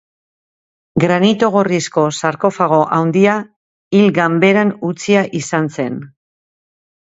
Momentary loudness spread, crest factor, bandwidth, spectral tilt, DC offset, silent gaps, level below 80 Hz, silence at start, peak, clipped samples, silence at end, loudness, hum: 9 LU; 16 dB; 8 kHz; -6 dB/octave; under 0.1%; 3.56-3.91 s; -58 dBFS; 0.95 s; 0 dBFS; under 0.1%; 0.95 s; -14 LUFS; none